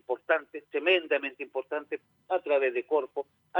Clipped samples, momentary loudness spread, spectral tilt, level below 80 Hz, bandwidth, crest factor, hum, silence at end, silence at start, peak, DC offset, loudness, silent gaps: under 0.1%; 12 LU; -4.5 dB/octave; under -90 dBFS; 19.5 kHz; 18 dB; none; 0 s; 0.1 s; -12 dBFS; under 0.1%; -29 LUFS; none